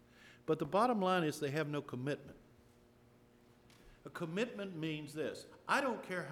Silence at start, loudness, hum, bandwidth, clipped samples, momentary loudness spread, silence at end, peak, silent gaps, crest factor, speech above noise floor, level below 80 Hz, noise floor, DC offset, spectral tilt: 0.2 s; -38 LUFS; none; 18 kHz; under 0.1%; 15 LU; 0 s; -20 dBFS; none; 20 dB; 28 dB; -74 dBFS; -65 dBFS; under 0.1%; -5.5 dB/octave